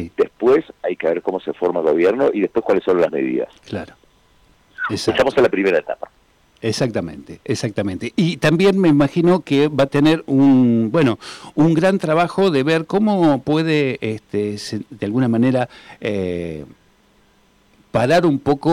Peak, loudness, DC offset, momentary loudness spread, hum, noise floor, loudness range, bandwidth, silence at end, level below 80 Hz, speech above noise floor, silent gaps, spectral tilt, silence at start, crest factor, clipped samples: -8 dBFS; -18 LUFS; under 0.1%; 12 LU; none; -55 dBFS; 6 LU; 13.5 kHz; 0 s; -54 dBFS; 38 dB; none; -6.5 dB/octave; 0 s; 10 dB; under 0.1%